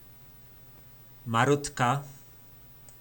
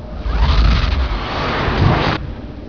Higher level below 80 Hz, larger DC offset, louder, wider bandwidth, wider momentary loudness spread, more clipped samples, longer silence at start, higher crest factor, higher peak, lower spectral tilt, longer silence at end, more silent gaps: second, -58 dBFS vs -18 dBFS; second, under 0.1% vs 0.7%; second, -27 LUFS vs -17 LUFS; first, 19 kHz vs 5.4 kHz; first, 24 LU vs 8 LU; neither; first, 1.25 s vs 0 s; first, 22 dB vs 16 dB; second, -8 dBFS vs 0 dBFS; second, -5 dB/octave vs -7 dB/octave; about the same, 0.1 s vs 0 s; neither